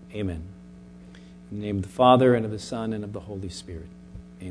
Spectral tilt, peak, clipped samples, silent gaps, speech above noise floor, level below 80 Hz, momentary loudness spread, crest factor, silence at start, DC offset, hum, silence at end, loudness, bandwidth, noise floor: -6.5 dB/octave; -4 dBFS; under 0.1%; none; 22 dB; -50 dBFS; 24 LU; 22 dB; 0 s; under 0.1%; none; 0 s; -24 LUFS; 11 kHz; -46 dBFS